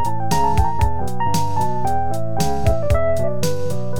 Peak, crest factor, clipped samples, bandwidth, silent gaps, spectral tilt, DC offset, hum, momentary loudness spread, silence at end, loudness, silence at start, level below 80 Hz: -4 dBFS; 16 dB; under 0.1%; 19.5 kHz; none; -6 dB/octave; 10%; none; 4 LU; 0 s; -21 LUFS; 0 s; -28 dBFS